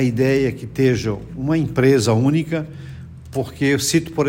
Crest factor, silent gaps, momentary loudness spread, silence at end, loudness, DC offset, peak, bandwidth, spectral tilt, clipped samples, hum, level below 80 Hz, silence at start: 16 dB; none; 14 LU; 0 s; -19 LUFS; under 0.1%; -4 dBFS; 16.5 kHz; -5.5 dB/octave; under 0.1%; none; -44 dBFS; 0 s